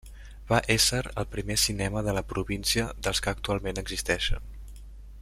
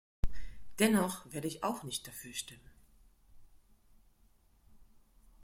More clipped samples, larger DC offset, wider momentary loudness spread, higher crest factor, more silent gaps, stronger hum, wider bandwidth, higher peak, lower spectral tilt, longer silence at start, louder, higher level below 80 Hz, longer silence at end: neither; neither; second, 13 LU vs 18 LU; about the same, 24 dB vs 24 dB; neither; neither; about the same, 16 kHz vs 16.5 kHz; first, -6 dBFS vs -12 dBFS; about the same, -3 dB/octave vs -4 dB/octave; second, 0.05 s vs 0.25 s; first, -27 LUFS vs -35 LUFS; first, -38 dBFS vs -50 dBFS; second, 0 s vs 0.65 s